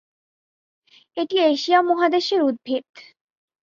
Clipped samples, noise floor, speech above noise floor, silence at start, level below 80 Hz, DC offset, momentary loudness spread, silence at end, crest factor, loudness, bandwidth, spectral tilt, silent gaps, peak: under 0.1%; under -90 dBFS; over 70 dB; 1.15 s; -72 dBFS; under 0.1%; 11 LU; 0.65 s; 18 dB; -20 LUFS; 7.4 kHz; -3 dB/octave; 2.89-2.93 s; -4 dBFS